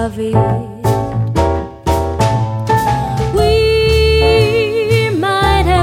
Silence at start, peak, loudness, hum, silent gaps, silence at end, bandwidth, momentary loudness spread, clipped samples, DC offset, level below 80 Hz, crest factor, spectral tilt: 0 s; 0 dBFS; -14 LUFS; none; none; 0 s; 16.5 kHz; 6 LU; under 0.1%; under 0.1%; -24 dBFS; 12 dB; -6 dB/octave